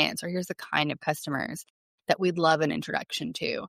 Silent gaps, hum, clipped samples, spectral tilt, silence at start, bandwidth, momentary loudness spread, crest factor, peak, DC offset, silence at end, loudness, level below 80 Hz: 1.70-1.98 s; none; under 0.1%; -4.5 dB/octave; 0 s; 16 kHz; 9 LU; 20 dB; -8 dBFS; under 0.1%; 0 s; -28 LUFS; -68 dBFS